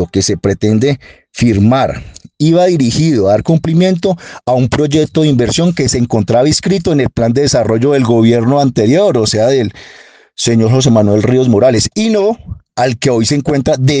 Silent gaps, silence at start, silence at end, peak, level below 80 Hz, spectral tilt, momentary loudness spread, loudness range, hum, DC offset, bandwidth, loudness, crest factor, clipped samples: none; 0 s; 0 s; 0 dBFS; -38 dBFS; -6 dB/octave; 6 LU; 1 LU; none; under 0.1%; 10 kHz; -11 LUFS; 10 dB; under 0.1%